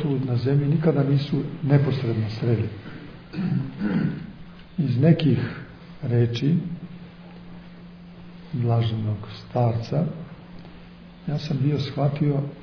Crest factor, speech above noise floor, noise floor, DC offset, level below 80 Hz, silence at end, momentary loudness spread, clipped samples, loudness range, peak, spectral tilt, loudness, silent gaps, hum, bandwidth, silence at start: 20 dB; 21 dB; -44 dBFS; under 0.1%; -52 dBFS; 0 s; 23 LU; under 0.1%; 5 LU; -6 dBFS; -9 dB/octave; -24 LUFS; none; none; 5.4 kHz; 0 s